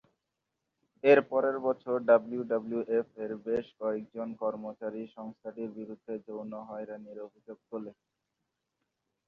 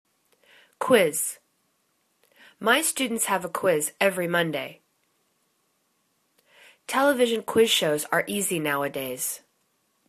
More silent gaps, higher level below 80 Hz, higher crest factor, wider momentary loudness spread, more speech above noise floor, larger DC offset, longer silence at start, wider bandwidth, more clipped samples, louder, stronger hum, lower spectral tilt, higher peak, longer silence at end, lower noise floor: neither; about the same, -76 dBFS vs -72 dBFS; about the same, 24 dB vs 22 dB; first, 19 LU vs 10 LU; first, 54 dB vs 47 dB; neither; first, 1.05 s vs 0.8 s; second, 6.2 kHz vs 14 kHz; neither; second, -31 LUFS vs -24 LUFS; neither; first, -8 dB/octave vs -2.5 dB/octave; second, -10 dBFS vs -6 dBFS; first, 1.35 s vs 0.7 s; first, -85 dBFS vs -71 dBFS